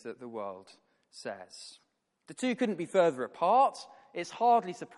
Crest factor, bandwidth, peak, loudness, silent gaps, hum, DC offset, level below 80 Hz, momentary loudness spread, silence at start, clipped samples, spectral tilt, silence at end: 18 dB; 11.5 kHz; -14 dBFS; -29 LUFS; none; none; under 0.1%; -86 dBFS; 21 LU; 0.05 s; under 0.1%; -5 dB/octave; 0.1 s